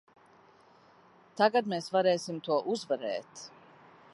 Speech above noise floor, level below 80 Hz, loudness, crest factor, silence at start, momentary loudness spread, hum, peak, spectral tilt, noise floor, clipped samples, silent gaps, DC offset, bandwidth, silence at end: 30 dB; -84 dBFS; -30 LUFS; 22 dB; 1.35 s; 21 LU; none; -10 dBFS; -4.5 dB/octave; -60 dBFS; under 0.1%; none; under 0.1%; 11.5 kHz; 0.65 s